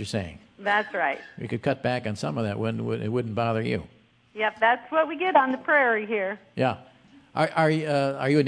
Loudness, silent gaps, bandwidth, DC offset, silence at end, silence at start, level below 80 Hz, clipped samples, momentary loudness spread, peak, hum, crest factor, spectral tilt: -25 LUFS; none; 10.5 kHz; under 0.1%; 0 s; 0 s; -62 dBFS; under 0.1%; 11 LU; -6 dBFS; none; 18 dB; -6.5 dB/octave